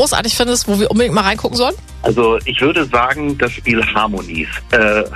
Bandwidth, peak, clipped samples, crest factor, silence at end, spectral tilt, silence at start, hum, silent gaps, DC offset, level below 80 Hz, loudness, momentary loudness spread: 14 kHz; -2 dBFS; under 0.1%; 14 dB; 0 s; -3.5 dB/octave; 0 s; none; none; under 0.1%; -32 dBFS; -15 LUFS; 5 LU